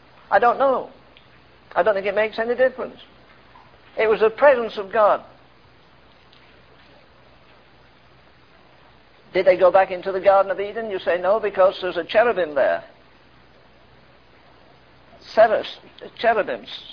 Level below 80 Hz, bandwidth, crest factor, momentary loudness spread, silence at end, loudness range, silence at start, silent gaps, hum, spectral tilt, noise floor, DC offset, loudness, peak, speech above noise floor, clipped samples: -60 dBFS; 5.4 kHz; 20 dB; 11 LU; 0 s; 6 LU; 0.3 s; none; none; -6 dB/octave; -53 dBFS; 0.1%; -20 LUFS; -4 dBFS; 33 dB; under 0.1%